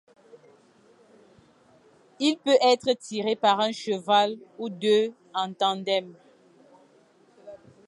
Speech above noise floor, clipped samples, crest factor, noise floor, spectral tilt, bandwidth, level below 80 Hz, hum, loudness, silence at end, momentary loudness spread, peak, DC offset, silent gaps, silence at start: 35 dB; under 0.1%; 20 dB; -59 dBFS; -4 dB/octave; 11.5 kHz; -78 dBFS; none; -25 LUFS; 0.3 s; 10 LU; -8 dBFS; under 0.1%; none; 2.2 s